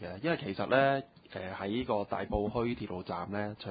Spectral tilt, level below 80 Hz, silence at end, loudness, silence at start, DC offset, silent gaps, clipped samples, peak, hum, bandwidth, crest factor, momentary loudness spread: -4.5 dB/octave; -54 dBFS; 0 s; -33 LUFS; 0 s; under 0.1%; none; under 0.1%; -12 dBFS; none; 4.9 kHz; 20 dB; 11 LU